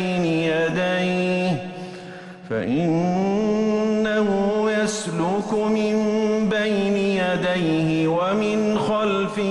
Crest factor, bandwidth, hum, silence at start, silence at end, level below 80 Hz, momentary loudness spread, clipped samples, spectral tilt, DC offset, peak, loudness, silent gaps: 10 dB; 11.5 kHz; none; 0 s; 0 s; -54 dBFS; 4 LU; under 0.1%; -6 dB/octave; under 0.1%; -10 dBFS; -21 LUFS; none